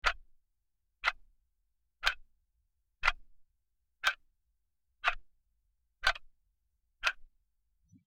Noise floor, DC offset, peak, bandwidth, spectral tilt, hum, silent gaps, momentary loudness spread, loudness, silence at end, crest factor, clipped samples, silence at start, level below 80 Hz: -83 dBFS; under 0.1%; -10 dBFS; 16.5 kHz; 0.5 dB/octave; none; none; 15 LU; -34 LUFS; 0.8 s; 30 dB; under 0.1%; 0.05 s; -52 dBFS